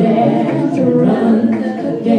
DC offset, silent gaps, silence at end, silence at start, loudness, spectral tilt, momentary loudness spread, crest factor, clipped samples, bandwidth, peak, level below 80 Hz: under 0.1%; none; 0 s; 0 s; -14 LUFS; -9 dB/octave; 6 LU; 10 dB; under 0.1%; 8.8 kHz; -2 dBFS; -60 dBFS